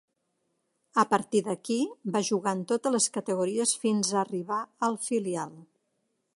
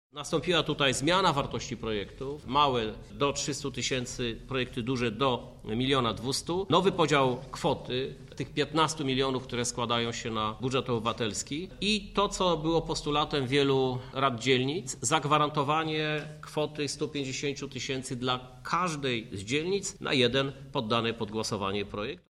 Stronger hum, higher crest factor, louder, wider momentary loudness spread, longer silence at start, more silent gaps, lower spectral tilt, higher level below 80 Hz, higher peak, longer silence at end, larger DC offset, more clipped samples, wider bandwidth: neither; about the same, 22 dB vs 20 dB; about the same, -28 LUFS vs -29 LUFS; second, 6 LU vs 9 LU; first, 0.95 s vs 0.15 s; neither; about the same, -4 dB/octave vs -4 dB/octave; second, -78 dBFS vs -52 dBFS; about the same, -8 dBFS vs -8 dBFS; first, 0.75 s vs 0.15 s; neither; neither; second, 11.5 kHz vs 13 kHz